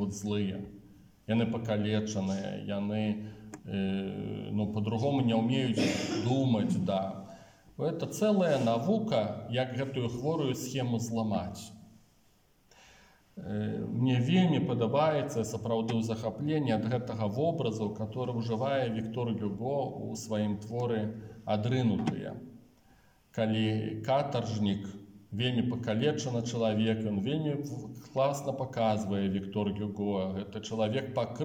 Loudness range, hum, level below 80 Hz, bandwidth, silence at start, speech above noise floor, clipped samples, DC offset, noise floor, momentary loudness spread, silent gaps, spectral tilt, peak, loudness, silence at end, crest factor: 4 LU; none; -66 dBFS; 16.5 kHz; 0 s; 36 dB; under 0.1%; under 0.1%; -66 dBFS; 10 LU; none; -6.5 dB/octave; -16 dBFS; -32 LUFS; 0 s; 16 dB